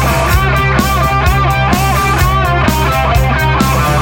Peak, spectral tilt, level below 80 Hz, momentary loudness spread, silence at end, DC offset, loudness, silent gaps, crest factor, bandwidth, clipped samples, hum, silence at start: 0 dBFS; -5 dB/octave; -18 dBFS; 1 LU; 0 s; under 0.1%; -11 LUFS; none; 10 dB; 17 kHz; under 0.1%; none; 0 s